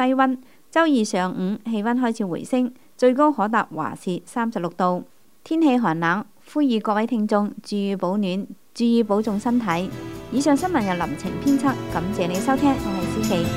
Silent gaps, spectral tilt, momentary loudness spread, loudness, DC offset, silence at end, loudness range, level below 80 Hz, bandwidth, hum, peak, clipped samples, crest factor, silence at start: none; -6 dB/octave; 8 LU; -22 LUFS; 0.3%; 0 s; 1 LU; -50 dBFS; 16 kHz; none; -4 dBFS; under 0.1%; 18 dB; 0 s